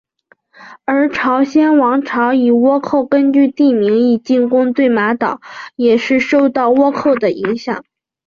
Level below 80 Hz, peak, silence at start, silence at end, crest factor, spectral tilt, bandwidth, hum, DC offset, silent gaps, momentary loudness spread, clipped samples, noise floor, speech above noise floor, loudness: -58 dBFS; -2 dBFS; 0.6 s; 0.45 s; 10 dB; -6.5 dB/octave; 7 kHz; none; under 0.1%; none; 8 LU; under 0.1%; -55 dBFS; 42 dB; -13 LUFS